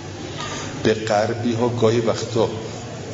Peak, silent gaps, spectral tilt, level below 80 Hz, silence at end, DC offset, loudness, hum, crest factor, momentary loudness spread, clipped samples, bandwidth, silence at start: -2 dBFS; none; -5.5 dB/octave; -52 dBFS; 0 s; under 0.1%; -22 LUFS; none; 18 dB; 12 LU; under 0.1%; 7.8 kHz; 0 s